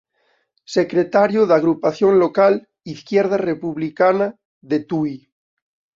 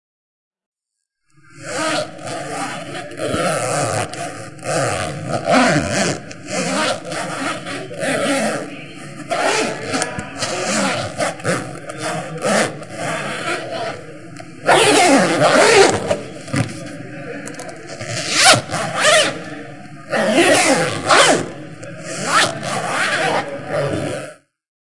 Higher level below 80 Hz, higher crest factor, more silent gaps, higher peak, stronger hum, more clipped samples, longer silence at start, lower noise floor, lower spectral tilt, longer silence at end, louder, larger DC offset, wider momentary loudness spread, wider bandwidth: second, -62 dBFS vs -56 dBFS; about the same, 16 dB vs 18 dB; first, 4.45-4.61 s vs 0.66-0.72 s; about the same, -2 dBFS vs 0 dBFS; neither; neither; first, 0.7 s vs 0.5 s; second, -65 dBFS vs -78 dBFS; first, -7 dB/octave vs -3 dB/octave; first, 0.8 s vs 0.3 s; about the same, -18 LUFS vs -17 LUFS; second, under 0.1% vs 0.9%; second, 10 LU vs 19 LU; second, 7.4 kHz vs 12 kHz